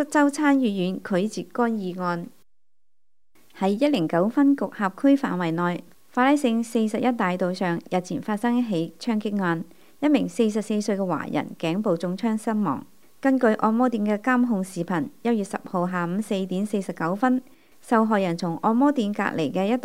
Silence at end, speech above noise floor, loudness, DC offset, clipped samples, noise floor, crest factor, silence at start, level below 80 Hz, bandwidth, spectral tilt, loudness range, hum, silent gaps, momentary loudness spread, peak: 0 s; 63 dB; -24 LUFS; 0.3%; under 0.1%; -86 dBFS; 18 dB; 0 s; -72 dBFS; 15.5 kHz; -6.5 dB/octave; 3 LU; none; none; 7 LU; -6 dBFS